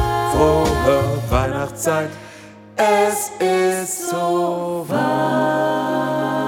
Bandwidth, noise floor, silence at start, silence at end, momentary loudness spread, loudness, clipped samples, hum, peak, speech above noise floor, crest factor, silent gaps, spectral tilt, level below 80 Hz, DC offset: 17.5 kHz; -40 dBFS; 0 s; 0 s; 7 LU; -19 LUFS; under 0.1%; none; -4 dBFS; 21 dB; 16 dB; none; -5 dB/octave; -34 dBFS; under 0.1%